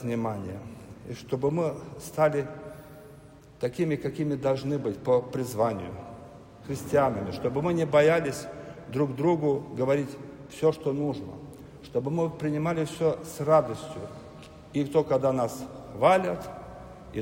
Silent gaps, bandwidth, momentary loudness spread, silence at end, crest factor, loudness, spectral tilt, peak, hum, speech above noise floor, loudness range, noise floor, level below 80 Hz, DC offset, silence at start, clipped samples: none; 16 kHz; 21 LU; 0 s; 20 dB; -28 LUFS; -7 dB/octave; -8 dBFS; none; 23 dB; 4 LU; -50 dBFS; -58 dBFS; under 0.1%; 0 s; under 0.1%